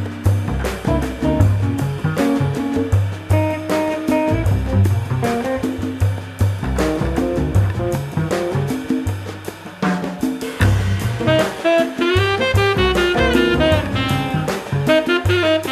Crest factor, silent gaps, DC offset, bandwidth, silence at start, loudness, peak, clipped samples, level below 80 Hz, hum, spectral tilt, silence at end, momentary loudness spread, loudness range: 16 dB; none; under 0.1%; 14 kHz; 0 s; -18 LUFS; 0 dBFS; under 0.1%; -30 dBFS; none; -6.5 dB/octave; 0 s; 6 LU; 5 LU